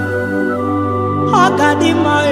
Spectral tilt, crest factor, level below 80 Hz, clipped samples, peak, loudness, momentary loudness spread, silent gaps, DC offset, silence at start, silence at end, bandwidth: -5.5 dB/octave; 14 dB; -52 dBFS; under 0.1%; 0 dBFS; -14 LUFS; 6 LU; none; under 0.1%; 0 s; 0 s; 15 kHz